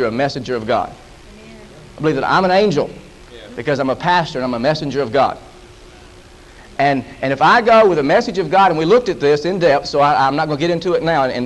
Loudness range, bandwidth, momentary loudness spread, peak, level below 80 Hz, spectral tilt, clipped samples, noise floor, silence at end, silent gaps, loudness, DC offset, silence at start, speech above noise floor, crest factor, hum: 6 LU; 11.5 kHz; 9 LU; -2 dBFS; -44 dBFS; -6 dB/octave; under 0.1%; -41 dBFS; 0 s; none; -15 LUFS; under 0.1%; 0 s; 26 dB; 14 dB; none